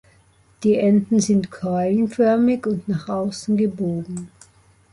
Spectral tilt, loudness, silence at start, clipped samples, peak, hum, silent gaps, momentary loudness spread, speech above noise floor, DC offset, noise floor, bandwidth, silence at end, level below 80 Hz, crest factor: -6.5 dB/octave; -20 LUFS; 0.6 s; under 0.1%; -6 dBFS; none; none; 9 LU; 36 dB; under 0.1%; -56 dBFS; 11.5 kHz; 0.65 s; -56 dBFS; 14 dB